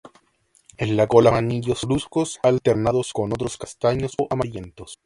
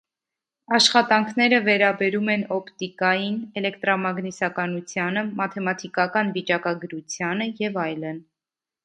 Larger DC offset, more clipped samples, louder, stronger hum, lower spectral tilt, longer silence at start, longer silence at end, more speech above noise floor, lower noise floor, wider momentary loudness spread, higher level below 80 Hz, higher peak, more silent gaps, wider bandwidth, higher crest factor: neither; neither; about the same, -21 LUFS vs -22 LUFS; neither; first, -6 dB/octave vs -4 dB/octave; about the same, 0.8 s vs 0.7 s; second, 0.1 s vs 0.65 s; second, 42 dB vs 67 dB; second, -62 dBFS vs -90 dBFS; about the same, 13 LU vs 11 LU; first, -46 dBFS vs -72 dBFS; about the same, 0 dBFS vs -2 dBFS; neither; first, 11.5 kHz vs 10 kHz; about the same, 22 dB vs 22 dB